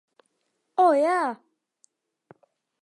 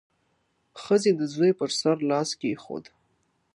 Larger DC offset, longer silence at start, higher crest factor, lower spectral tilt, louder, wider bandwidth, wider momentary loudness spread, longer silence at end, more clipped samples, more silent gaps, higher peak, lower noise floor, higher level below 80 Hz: neither; about the same, 0.8 s vs 0.75 s; about the same, 18 dB vs 18 dB; about the same, -4 dB/octave vs -5 dB/octave; about the same, -23 LUFS vs -25 LUFS; about the same, 11 kHz vs 11.5 kHz; about the same, 14 LU vs 16 LU; first, 1.45 s vs 0.75 s; neither; neither; about the same, -8 dBFS vs -10 dBFS; first, -76 dBFS vs -71 dBFS; second, -90 dBFS vs -74 dBFS